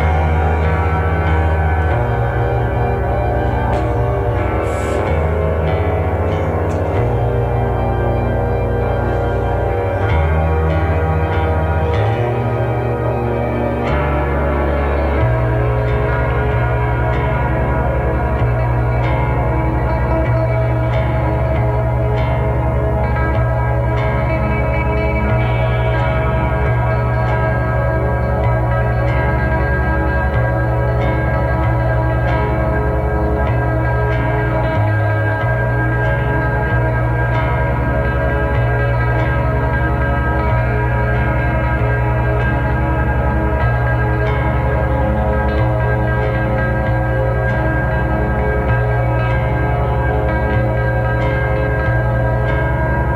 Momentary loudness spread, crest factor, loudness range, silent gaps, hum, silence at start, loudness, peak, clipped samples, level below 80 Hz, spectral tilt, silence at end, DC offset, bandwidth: 1 LU; 12 dB; 1 LU; none; none; 0 s; -17 LUFS; -2 dBFS; under 0.1%; -20 dBFS; -9 dB/octave; 0 s; under 0.1%; 4.6 kHz